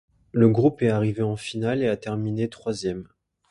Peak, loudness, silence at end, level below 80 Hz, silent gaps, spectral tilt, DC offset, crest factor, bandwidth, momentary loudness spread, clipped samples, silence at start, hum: -6 dBFS; -24 LUFS; 0.45 s; -56 dBFS; none; -7.5 dB/octave; under 0.1%; 18 dB; 11.5 kHz; 10 LU; under 0.1%; 0.35 s; none